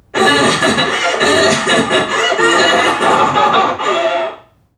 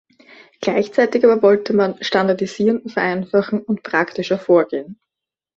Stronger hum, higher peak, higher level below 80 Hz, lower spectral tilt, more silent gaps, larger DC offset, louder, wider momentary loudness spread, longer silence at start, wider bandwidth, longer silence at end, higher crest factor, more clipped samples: neither; about the same, 0 dBFS vs -2 dBFS; first, -50 dBFS vs -62 dBFS; second, -2.5 dB/octave vs -6 dB/octave; neither; neither; first, -12 LUFS vs -18 LUFS; second, 5 LU vs 8 LU; second, 0.15 s vs 0.6 s; first, 15.5 kHz vs 7.8 kHz; second, 0.4 s vs 0.65 s; about the same, 12 dB vs 16 dB; neither